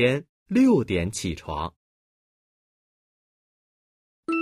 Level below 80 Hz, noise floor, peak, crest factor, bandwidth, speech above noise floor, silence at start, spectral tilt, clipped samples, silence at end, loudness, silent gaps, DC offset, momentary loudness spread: -50 dBFS; under -90 dBFS; -8 dBFS; 20 dB; 12.5 kHz; over 67 dB; 0 s; -6 dB/octave; under 0.1%; 0 s; -24 LUFS; 0.29-0.46 s, 1.76-4.23 s; under 0.1%; 14 LU